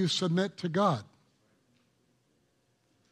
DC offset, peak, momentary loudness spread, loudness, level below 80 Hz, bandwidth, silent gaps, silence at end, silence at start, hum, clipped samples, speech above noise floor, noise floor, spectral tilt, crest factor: under 0.1%; -14 dBFS; 4 LU; -30 LUFS; -78 dBFS; 11.5 kHz; none; 2.05 s; 0 s; none; under 0.1%; 43 dB; -73 dBFS; -5.5 dB/octave; 20 dB